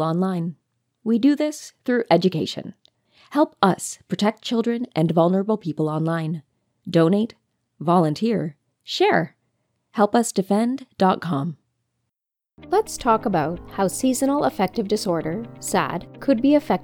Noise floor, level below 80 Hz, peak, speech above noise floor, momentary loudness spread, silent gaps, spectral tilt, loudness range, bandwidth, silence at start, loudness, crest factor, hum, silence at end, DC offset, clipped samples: -84 dBFS; -56 dBFS; 0 dBFS; 63 dB; 11 LU; none; -5.5 dB/octave; 2 LU; 19 kHz; 0 s; -22 LUFS; 22 dB; none; 0 s; under 0.1%; under 0.1%